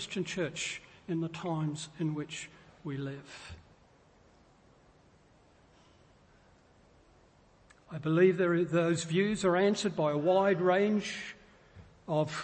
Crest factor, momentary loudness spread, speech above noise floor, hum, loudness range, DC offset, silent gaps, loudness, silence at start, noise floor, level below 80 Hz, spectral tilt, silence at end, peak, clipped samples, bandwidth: 20 dB; 19 LU; 32 dB; none; 18 LU; under 0.1%; none; -31 LUFS; 0 s; -63 dBFS; -66 dBFS; -5.5 dB/octave; 0 s; -14 dBFS; under 0.1%; 8.8 kHz